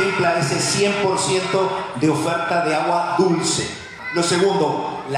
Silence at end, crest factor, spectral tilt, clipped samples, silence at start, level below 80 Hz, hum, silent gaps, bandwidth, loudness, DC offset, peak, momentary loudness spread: 0 s; 14 dB; -4 dB/octave; under 0.1%; 0 s; -56 dBFS; none; none; 15 kHz; -19 LUFS; under 0.1%; -6 dBFS; 5 LU